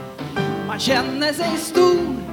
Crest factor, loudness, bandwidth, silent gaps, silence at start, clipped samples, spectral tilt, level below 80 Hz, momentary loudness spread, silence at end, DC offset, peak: 16 dB; -20 LUFS; 18 kHz; none; 0 s; under 0.1%; -4.5 dB/octave; -48 dBFS; 8 LU; 0 s; under 0.1%; -4 dBFS